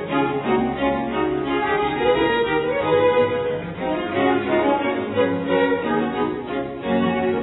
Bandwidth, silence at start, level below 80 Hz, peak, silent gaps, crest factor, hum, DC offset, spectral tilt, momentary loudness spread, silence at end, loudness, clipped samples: 4.1 kHz; 0 s; -46 dBFS; -6 dBFS; none; 14 dB; none; under 0.1%; -10 dB/octave; 6 LU; 0 s; -21 LUFS; under 0.1%